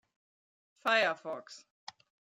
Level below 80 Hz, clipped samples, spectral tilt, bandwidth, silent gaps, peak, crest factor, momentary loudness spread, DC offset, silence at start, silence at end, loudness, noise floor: under -90 dBFS; under 0.1%; -2 dB/octave; 13.5 kHz; none; -14 dBFS; 22 dB; 23 LU; under 0.1%; 0.85 s; 0.8 s; -31 LUFS; under -90 dBFS